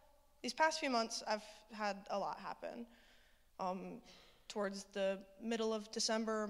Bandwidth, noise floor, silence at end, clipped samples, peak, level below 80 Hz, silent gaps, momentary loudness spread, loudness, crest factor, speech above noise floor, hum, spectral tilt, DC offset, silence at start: 15.5 kHz; -68 dBFS; 0 s; under 0.1%; -18 dBFS; -74 dBFS; none; 17 LU; -41 LUFS; 24 dB; 27 dB; none; -3 dB/octave; under 0.1%; 0.45 s